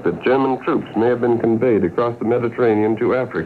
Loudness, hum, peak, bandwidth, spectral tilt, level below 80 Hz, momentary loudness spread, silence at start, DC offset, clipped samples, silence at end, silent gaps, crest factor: -18 LUFS; none; -4 dBFS; 4.6 kHz; -9 dB/octave; -56 dBFS; 3 LU; 0 s; under 0.1%; under 0.1%; 0 s; none; 14 dB